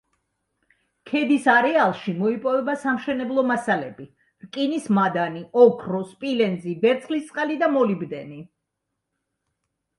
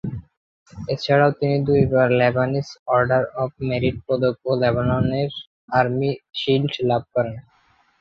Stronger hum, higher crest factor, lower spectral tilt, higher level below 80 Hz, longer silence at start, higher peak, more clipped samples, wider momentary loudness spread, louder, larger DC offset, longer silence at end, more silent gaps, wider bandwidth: neither; about the same, 20 dB vs 18 dB; about the same, -6.5 dB/octave vs -7.5 dB/octave; second, -68 dBFS vs -46 dBFS; first, 1.05 s vs 0.05 s; about the same, -2 dBFS vs -4 dBFS; neither; about the same, 12 LU vs 11 LU; about the same, -22 LUFS vs -21 LUFS; neither; first, 1.55 s vs 0.6 s; second, none vs 0.37-0.66 s, 2.79-2.86 s, 5.47-5.68 s; first, 11.5 kHz vs 6.8 kHz